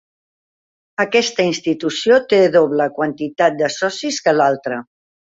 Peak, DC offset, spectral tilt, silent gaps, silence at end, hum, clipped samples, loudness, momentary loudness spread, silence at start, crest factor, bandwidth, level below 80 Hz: -2 dBFS; under 0.1%; -4 dB/octave; none; 0.4 s; none; under 0.1%; -16 LUFS; 9 LU; 1 s; 16 dB; 8 kHz; -64 dBFS